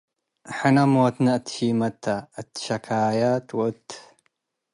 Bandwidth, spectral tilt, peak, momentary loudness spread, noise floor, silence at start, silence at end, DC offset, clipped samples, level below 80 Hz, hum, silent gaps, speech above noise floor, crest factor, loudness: 11.5 kHz; -6.5 dB/octave; -6 dBFS; 17 LU; -72 dBFS; 0.45 s; 0.7 s; under 0.1%; under 0.1%; -66 dBFS; none; none; 50 dB; 16 dB; -23 LUFS